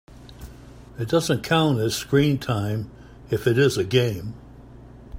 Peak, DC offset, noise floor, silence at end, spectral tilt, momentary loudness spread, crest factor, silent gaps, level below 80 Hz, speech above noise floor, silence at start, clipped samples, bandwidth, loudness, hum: -6 dBFS; under 0.1%; -44 dBFS; 0 s; -5.5 dB/octave; 23 LU; 18 dB; none; -48 dBFS; 22 dB; 0.1 s; under 0.1%; 16 kHz; -22 LUFS; none